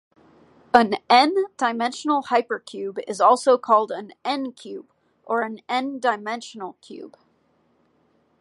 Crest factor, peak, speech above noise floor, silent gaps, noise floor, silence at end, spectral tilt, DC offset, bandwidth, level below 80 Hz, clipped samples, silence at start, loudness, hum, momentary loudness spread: 22 dB; 0 dBFS; 42 dB; none; -64 dBFS; 1.35 s; -3.5 dB/octave; under 0.1%; 11.5 kHz; -70 dBFS; under 0.1%; 0.75 s; -22 LUFS; none; 20 LU